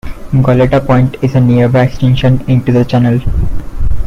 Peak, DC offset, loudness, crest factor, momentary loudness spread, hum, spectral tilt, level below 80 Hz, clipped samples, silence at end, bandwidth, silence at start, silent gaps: 0 dBFS; under 0.1%; -11 LUFS; 8 dB; 9 LU; none; -9 dB/octave; -20 dBFS; under 0.1%; 0 s; 6.6 kHz; 0.05 s; none